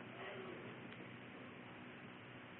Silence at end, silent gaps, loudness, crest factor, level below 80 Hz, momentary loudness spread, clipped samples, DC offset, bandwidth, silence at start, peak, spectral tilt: 0 s; none; -53 LUFS; 16 dB; -84 dBFS; 5 LU; under 0.1%; under 0.1%; 4 kHz; 0 s; -38 dBFS; -3.5 dB/octave